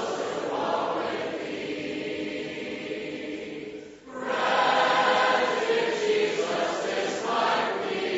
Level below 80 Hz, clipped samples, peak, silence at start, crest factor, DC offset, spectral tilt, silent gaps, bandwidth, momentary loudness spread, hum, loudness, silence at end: -68 dBFS; under 0.1%; -10 dBFS; 0 s; 18 dB; under 0.1%; -1 dB/octave; none; 8 kHz; 13 LU; none; -27 LUFS; 0 s